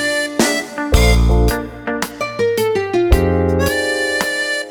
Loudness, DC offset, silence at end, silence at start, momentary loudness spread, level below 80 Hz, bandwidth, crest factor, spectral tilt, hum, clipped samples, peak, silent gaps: -16 LUFS; under 0.1%; 0 s; 0 s; 8 LU; -20 dBFS; over 20 kHz; 16 dB; -4.5 dB/octave; none; under 0.1%; 0 dBFS; none